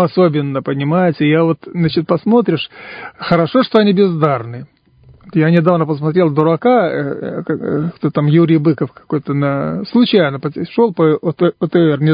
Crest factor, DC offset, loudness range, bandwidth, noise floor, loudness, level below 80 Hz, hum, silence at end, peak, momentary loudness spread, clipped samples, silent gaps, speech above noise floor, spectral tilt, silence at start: 14 dB; under 0.1%; 1 LU; 5.2 kHz; -46 dBFS; -14 LUFS; -54 dBFS; none; 0 s; 0 dBFS; 9 LU; under 0.1%; none; 32 dB; -10.5 dB/octave; 0 s